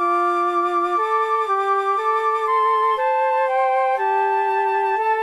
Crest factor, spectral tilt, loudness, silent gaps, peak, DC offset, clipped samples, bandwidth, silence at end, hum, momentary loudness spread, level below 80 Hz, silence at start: 10 dB; -2.5 dB/octave; -19 LUFS; none; -8 dBFS; under 0.1%; under 0.1%; 12.5 kHz; 0 s; none; 1 LU; -70 dBFS; 0 s